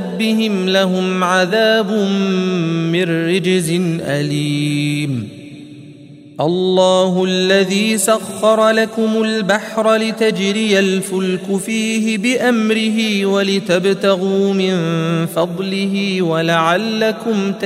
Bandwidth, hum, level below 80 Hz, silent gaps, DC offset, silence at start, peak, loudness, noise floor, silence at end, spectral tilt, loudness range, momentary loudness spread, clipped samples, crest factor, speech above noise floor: 16 kHz; none; -62 dBFS; none; under 0.1%; 0 s; 0 dBFS; -15 LUFS; -38 dBFS; 0 s; -5 dB/octave; 3 LU; 5 LU; under 0.1%; 16 dB; 23 dB